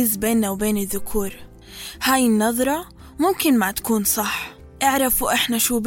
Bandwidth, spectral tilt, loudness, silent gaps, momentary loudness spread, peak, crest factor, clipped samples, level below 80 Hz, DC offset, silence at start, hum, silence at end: 17 kHz; -3 dB/octave; -20 LUFS; none; 13 LU; -6 dBFS; 14 dB; under 0.1%; -42 dBFS; under 0.1%; 0 s; none; 0 s